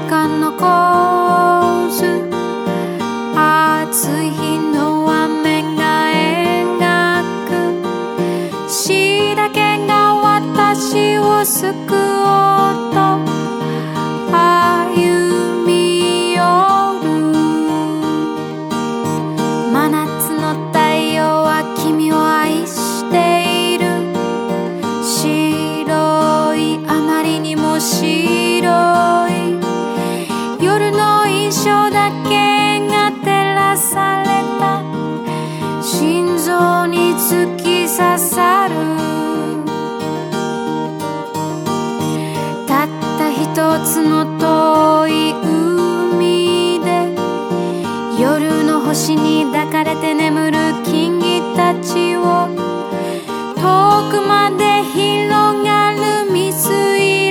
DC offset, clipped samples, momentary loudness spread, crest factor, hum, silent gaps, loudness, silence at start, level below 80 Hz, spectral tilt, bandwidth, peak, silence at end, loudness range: under 0.1%; under 0.1%; 8 LU; 14 dB; none; none; -14 LUFS; 0 s; -62 dBFS; -4.5 dB/octave; 18 kHz; 0 dBFS; 0 s; 3 LU